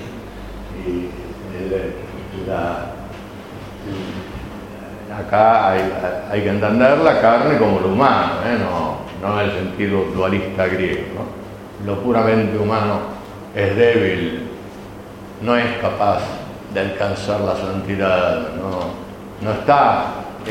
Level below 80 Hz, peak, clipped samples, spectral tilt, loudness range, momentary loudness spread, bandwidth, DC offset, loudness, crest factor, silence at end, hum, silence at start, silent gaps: -42 dBFS; 0 dBFS; under 0.1%; -7 dB/octave; 11 LU; 19 LU; 16.5 kHz; under 0.1%; -18 LUFS; 18 dB; 0 s; none; 0 s; none